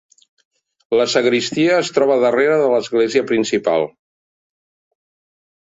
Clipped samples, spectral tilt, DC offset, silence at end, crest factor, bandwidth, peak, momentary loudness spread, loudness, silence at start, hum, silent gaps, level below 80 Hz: under 0.1%; -4 dB/octave; under 0.1%; 1.7 s; 16 dB; 8 kHz; -2 dBFS; 4 LU; -16 LUFS; 0.9 s; none; none; -62 dBFS